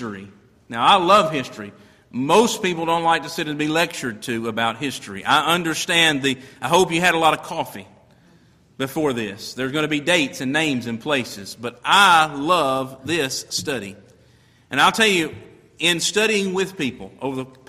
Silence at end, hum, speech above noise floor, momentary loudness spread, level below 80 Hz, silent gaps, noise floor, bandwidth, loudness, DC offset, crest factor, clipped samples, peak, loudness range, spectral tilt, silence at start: 0.2 s; none; 34 dB; 14 LU; -58 dBFS; none; -54 dBFS; 15.5 kHz; -19 LUFS; under 0.1%; 18 dB; under 0.1%; -2 dBFS; 4 LU; -3 dB/octave; 0 s